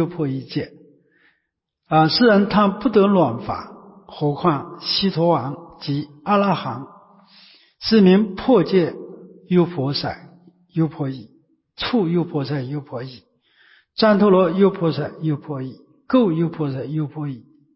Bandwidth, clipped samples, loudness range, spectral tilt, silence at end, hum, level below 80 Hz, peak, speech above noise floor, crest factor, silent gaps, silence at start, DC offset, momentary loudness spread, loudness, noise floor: 5.8 kHz; under 0.1%; 6 LU; -10.5 dB/octave; 0.35 s; none; -54 dBFS; -4 dBFS; 57 dB; 16 dB; none; 0 s; under 0.1%; 17 LU; -19 LUFS; -76 dBFS